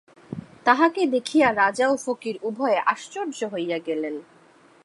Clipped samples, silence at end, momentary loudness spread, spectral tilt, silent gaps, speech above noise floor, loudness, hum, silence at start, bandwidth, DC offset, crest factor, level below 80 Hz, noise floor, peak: under 0.1%; 0.6 s; 13 LU; -4 dB/octave; none; 32 dB; -23 LUFS; none; 0.3 s; 11.5 kHz; under 0.1%; 22 dB; -66 dBFS; -54 dBFS; -2 dBFS